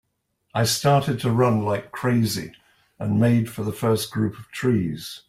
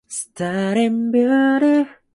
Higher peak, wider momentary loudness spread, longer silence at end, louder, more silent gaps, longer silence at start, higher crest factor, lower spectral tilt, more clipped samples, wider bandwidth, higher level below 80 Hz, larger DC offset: about the same, -6 dBFS vs -6 dBFS; about the same, 9 LU vs 9 LU; second, 0.1 s vs 0.25 s; second, -23 LUFS vs -18 LUFS; neither; first, 0.55 s vs 0.1 s; about the same, 16 dB vs 12 dB; about the same, -5.5 dB/octave vs -5.5 dB/octave; neither; first, 16 kHz vs 11.5 kHz; first, -56 dBFS vs -64 dBFS; neither